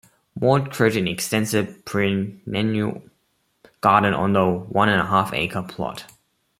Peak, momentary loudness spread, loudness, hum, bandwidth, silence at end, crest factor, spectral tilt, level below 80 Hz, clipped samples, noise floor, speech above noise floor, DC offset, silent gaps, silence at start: -2 dBFS; 11 LU; -21 LUFS; none; 16.5 kHz; 0.55 s; 20 dB; -5.5 dB/octave; -56 dBFS; under 0.1%; -68 dBFS; 48 dB; under 0.1%; none; 0.35 s